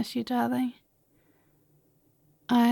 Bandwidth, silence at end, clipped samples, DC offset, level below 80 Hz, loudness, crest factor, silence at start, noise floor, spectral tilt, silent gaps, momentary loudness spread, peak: 17.5 kHz; 0 s; under 0.1%; under 0.1%; -74 dBFS; -28 LUFS; 16 dB; 0 s; -67 dBFS; -5 dB/octave; none; 10 LU; -12 dBFS